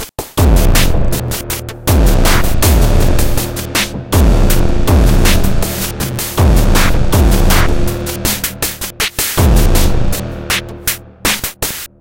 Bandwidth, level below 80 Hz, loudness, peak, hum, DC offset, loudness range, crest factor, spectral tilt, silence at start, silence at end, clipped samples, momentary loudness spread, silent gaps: 17.5 kHz; -14 dBFS; -14 LUFS; 0 dBFS; none; under 0.1%; 2 LU; 10 dB; -4.5 dB/octave; 0 s; 0.15 s; under 0.1%; 7 LU; none